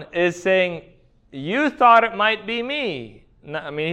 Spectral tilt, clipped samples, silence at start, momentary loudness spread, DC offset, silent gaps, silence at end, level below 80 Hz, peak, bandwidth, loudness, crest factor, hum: -5 dB/octave; under 0.1%; 0 s; 19 LU; under 0.1%; none; 0 s; -56 dBFS; -2 dBFS; 9.2 kHz; -19 LUFS; 18 dB; none